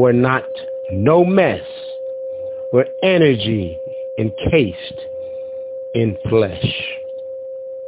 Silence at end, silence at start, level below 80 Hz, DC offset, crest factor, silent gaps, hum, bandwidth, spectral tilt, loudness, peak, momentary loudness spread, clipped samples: 0 s; 0 s; -42 dBFS; under 0.1%; 18 dB; none; none; 4 kHz; -11 dB/octave; -18 LUFS; 0 dBFS; 15 LU; under 0.1%